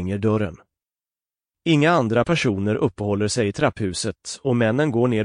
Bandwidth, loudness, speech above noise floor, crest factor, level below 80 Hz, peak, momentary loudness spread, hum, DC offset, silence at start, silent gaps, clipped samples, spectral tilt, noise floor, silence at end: 10.5 kHz; -21 LUFS; over 70 dB; 16 dB; -52 dBFS; -6 dBFS; 9 LU; none; under 0.1%; 0 s; none; under 0.1%; -5.5 dB/octave; under -90 dBFS; 0 s